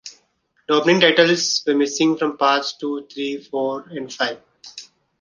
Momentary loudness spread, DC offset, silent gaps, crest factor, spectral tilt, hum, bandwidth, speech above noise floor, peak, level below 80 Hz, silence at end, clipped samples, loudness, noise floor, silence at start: 23 LU; under 0.1%; none; 18 dB; -3.5 dB/octave; none; 10 kHz; 46 dB; -2 dBFS; -68 dBFS; 0.35 s; under 0.1%; -19 LUFS; -65 dBFS; 0.05 s